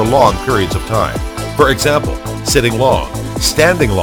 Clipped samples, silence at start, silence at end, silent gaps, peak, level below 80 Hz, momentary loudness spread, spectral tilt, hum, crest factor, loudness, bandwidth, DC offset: under 0.1%; 0 s; 0 s; none; 0 dBFS; -26 dBFS; 10 LU; -4.5 dB/octave; none; 14 dB; -13 LUFS; over 20 kHz; under 0.1%